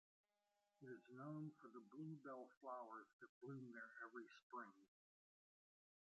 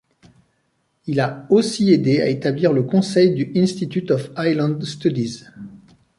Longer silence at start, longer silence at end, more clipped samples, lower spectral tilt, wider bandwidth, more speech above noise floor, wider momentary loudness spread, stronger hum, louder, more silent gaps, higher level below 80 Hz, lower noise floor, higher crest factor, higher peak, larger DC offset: second, 0.8 s vs 1.05 s; first, 1.25 s vs 0.4 s; neither; about the same, -6.5 dB/octave vs -6.5 dB/octave; second, 7.6 kHz vs 11.5 kHz; second, 32 dB vs 49 dB; second, 7 LU vs 13 LU; neither; second, -58 LUFS vs -19 LUFS; first, 2.57-2.61 s, 3.13-3.19 s, 3.29-3.41 s, 4.43-4.50 s vs none; second, under -90 dBFS vs -60 dBFS; first, -90 dBFS vs -67 dBFS; about the same, 18 dB vs 16 dB; second, -42 dBFS vs -4 dBFS; neither